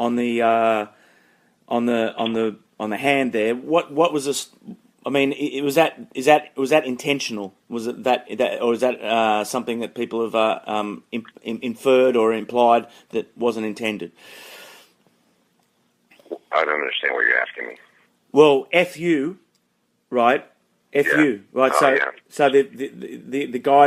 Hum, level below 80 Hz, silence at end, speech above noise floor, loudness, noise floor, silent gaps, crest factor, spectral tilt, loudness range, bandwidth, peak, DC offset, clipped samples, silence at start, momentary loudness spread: none; -72 dBFS; 0 s; 48 dB; -21 LUFS; -68 dBFS; none; 20 dB; -4.5 dB/octave; 4 LU; 15.5 kHz; -2 dBFS; under 0.1%; under 0.1%; 0 s; 14 LU